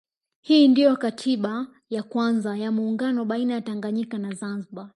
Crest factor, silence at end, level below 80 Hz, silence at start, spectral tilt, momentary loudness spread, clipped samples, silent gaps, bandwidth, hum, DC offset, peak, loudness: 16 dB; 0.1 s; -76 dBFS; 0.45 s; -6 dB/octave; 15 LU; under 0.1%; none; 11.5 kHz; none; under 0.1%; -6 dBFS; -23 LUFS